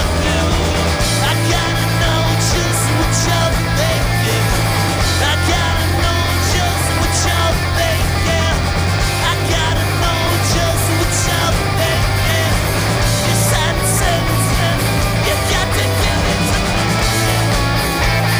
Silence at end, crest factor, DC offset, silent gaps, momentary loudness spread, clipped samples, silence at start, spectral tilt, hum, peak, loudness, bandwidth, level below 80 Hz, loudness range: 0 s; 12 dB; under 0.1%; none; 1 LU; under 0.1%; 0 s; -4 dB/octave; none; -2 dBFS; -15 LUFS; over 20 kHz; -24 dBFS; 1 LU